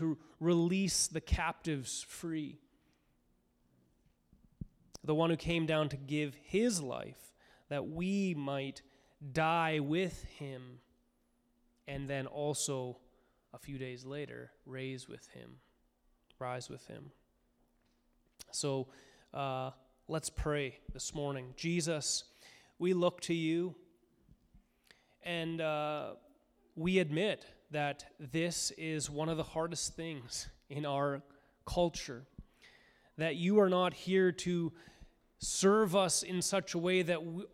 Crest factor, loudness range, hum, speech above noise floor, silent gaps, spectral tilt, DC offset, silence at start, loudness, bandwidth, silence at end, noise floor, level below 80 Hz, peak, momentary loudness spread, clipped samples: 22 dB; 12 LU; none; 40 dB; none; -4.5 dB/octave; under 0.1%; 0 s; -35 LUFS; 15.5 kHz; 0.05 s; -75 dBFS; -56 dBFS; -16 dBFS; 17 LU; under 0.1%